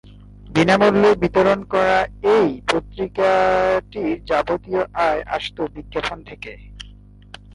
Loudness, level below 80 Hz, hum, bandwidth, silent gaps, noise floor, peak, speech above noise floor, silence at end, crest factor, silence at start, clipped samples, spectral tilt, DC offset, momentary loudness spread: -19 LUFS; -42 dBFS; 50 Hz at -45 dBFS; 11.5 kHz; none; -43 dBFS; -2 dBFS; 25 dB; 0.65 s; 16 dB; 0.45 s; under 0.1%; -6 dB/octave; under 0.1%; 16 LU